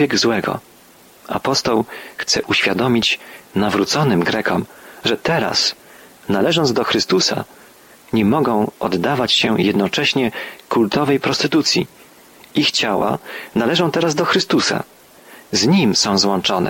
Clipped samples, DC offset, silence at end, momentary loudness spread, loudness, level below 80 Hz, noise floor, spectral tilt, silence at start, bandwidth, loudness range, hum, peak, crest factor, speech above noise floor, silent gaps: under 0.1%; under 0.1%; 0 s; 10 LU; -17 LUFS; -52 dBFS; -47 dBFS; -4 dB/octave; 0 s; 17 kHz; 1 LU; none; -4 dBFS; 14 dB; 29 dB; none